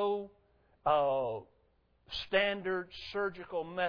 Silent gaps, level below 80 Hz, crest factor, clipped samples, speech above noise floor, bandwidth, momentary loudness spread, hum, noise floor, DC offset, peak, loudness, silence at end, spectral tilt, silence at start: none; -64 dBFS; 18 dB; under 0.1%; 38 dB; 5.4 kHz; 12 LU; none; -71 dBFS; under 0.1%; -16 dBFS; -34 LUFS; 0 s; -6 dB/octave; 0 s